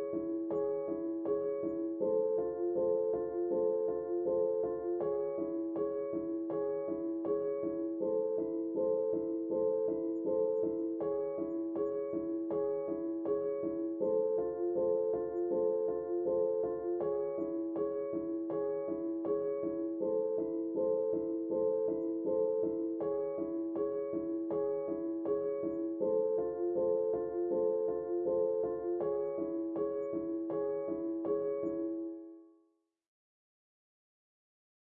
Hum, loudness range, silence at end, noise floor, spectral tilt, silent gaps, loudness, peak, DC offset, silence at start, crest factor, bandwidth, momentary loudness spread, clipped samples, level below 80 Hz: none; 3 LU; 2.55 s; -75 dBFS; -10.5 dB/octave; none; -35 LUFS; -22 dBFS; under 0.1%; 0 s; 12 dB; 2.4 kHz; 5 LU; under 0.1%; -72 dBFS